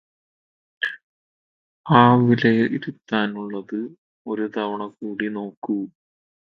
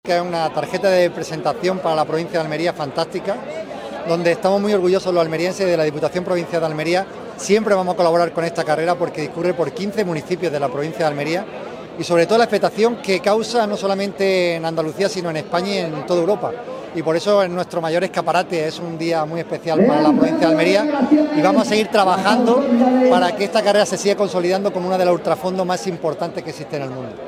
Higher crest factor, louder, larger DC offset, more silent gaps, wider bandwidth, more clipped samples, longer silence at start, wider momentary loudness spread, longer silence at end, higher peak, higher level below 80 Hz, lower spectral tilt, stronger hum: about the same, 22 dB vs 18 dB; second, -22 LUFS vs -18 LUFS; neither; first, 1.03-1.84 s, 3.98-4.25 s, 5.57-5.62 s vs none; second, 5.8 kHz vs 15.5 kHz; neither; first, 0.8 s vs 0.05 s; first, 17 LU vs 9 LU; first, 0.55 s vs 0 s; about the same, 0 dBFS vs 0 dBFS; about the same, -62 dBFS vs -60 dBFS; first, -8.5 dB/octave vs -5.5 dB/octave; neither